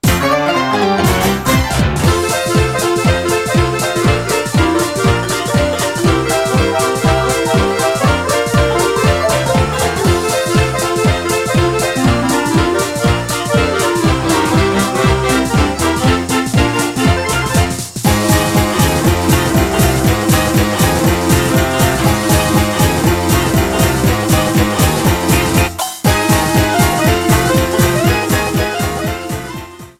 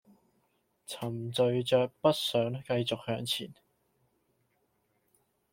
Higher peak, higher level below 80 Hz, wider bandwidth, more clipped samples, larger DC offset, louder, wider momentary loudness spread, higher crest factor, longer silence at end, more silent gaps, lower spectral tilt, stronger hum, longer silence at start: first, 0 dBFS vs -10 dBFS; first, -26 dBFS vs -70 dBFS; about the same, 17 kHz vs 16.5 kHz; neither; neither; first, -13 LUFS vs -31 LUFS; second, 3 LU vs 11 LU; second, 12 dB vs 24 dB; second, 0.1 s vs 2 s; neither; about the same, -5 dB/octave vs -5 dB/octave; neither; second, 0.05 s vs 0.9 s